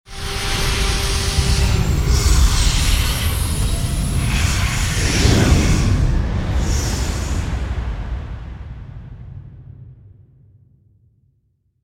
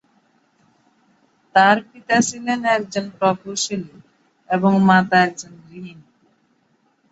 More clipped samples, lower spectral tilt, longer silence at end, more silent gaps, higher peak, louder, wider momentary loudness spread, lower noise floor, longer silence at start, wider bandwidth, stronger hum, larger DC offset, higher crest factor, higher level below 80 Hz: neither; about the same, -4 dB/octave vs -4.5 dB/octave; first, 1.75 s vs 1.2 s; neither; about the same, 0 dBFS vs -2 dBFS; about the same, -19 LUFS vs -18 LUFS; second, 19 LU vs 23 LU; about the same, -64 dBFS vs -63 dBFS; second, 0.1 s vs 1.55 s; first, 16.5 kHz vs 8.2 kHz; neither; neither; about the same, 18 dB vs 20 dB; first, -20 dBFS vs -62 dBFS